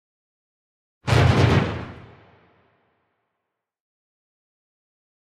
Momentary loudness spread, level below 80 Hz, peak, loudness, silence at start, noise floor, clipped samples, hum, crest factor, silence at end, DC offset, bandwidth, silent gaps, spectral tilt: 17 LU; -42 dBFS; -4 dBFS; -19 LUFS; 1.05 s; -82 dBFS; under 0.1%; none; 20 dB; 3.2 s; under 0.1%; 12 kHz; none; -6.5 dB/octave